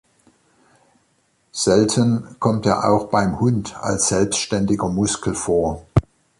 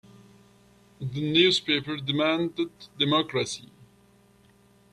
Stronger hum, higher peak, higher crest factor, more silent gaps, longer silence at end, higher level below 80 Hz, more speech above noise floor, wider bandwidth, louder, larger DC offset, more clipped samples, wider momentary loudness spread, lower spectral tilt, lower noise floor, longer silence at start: second, none vs 60 Hz at -60 dBFS; first, -2 dBFS vs -6 dBFS; about the same, 18 dB vs 22 dB; neither; second, 0.4 s vs 1.3 s; first, -40 dBFS vs -66 dBFS; first, 45 dB vs 33 dB; about the same, 11.5 kHz vs 12.5 kHz; first, -19 LUFS vs -25 LUFS; neither; neither; second, 5 LU vs 14 LU; about the same, -5 dB/octave vs -4.5 dB/octave; first, -64 dBFS vs -59 dBFS; first, 1.55 s vs 1 s